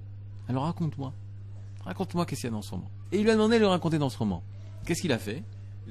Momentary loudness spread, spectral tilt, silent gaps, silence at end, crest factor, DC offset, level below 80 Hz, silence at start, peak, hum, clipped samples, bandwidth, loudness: 20 LU; -6 dB/octave; none; 0 s; 20 dB; 0.3%; -54 dBFS; 0 s; -10 dBFS; 50 Hz at -40 dBFS; under 0.1%; 13 kHz; -29 LUFS